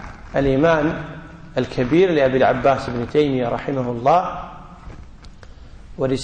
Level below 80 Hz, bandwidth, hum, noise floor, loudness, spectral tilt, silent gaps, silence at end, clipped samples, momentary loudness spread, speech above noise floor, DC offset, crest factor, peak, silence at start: -40 dBFS; 9.2 kHz; none; -40 dBFS; -19 LUFS; -7 dB/octave; none; 0 s; under 0.1%; 19 LU; 22 dB; under 0.1%; 14 dB; -6 dBFS; 0 s